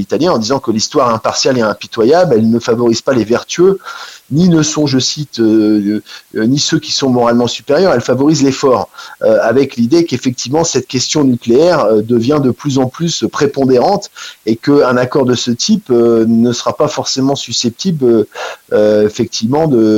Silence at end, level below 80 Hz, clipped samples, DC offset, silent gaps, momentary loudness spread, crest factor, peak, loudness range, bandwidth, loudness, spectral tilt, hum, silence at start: 0 s; -50 dBFS; under 0.1%; under 0.1%; none; 6 LU; 12 dB; 0 dBFS; 1 LU; 16.5 kHz; -12 LUFS; -5 dB/octave; none; 0 s